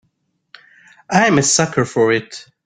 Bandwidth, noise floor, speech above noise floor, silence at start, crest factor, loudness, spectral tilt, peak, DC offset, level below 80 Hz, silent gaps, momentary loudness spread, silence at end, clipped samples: 10 kHz; -67 dBFS; 52 dB; 1.1 s; 18 dB; -15 LUFS; -3.5 dB/octave; 0 dBFS; under 0.1%; -54 dBFS; none; 7 LU; 0.25 s; under 0.1%